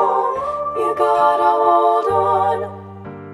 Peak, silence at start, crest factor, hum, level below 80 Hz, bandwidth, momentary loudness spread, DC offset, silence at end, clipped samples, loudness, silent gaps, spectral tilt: -2 dBFS; 0 s; 14 dB; none; -54 dBFS; 12.5 kHz; 16 LU; under 0.1%; 0 s; under 0.1%; -16 LUFS; none; -6.5 dB/octave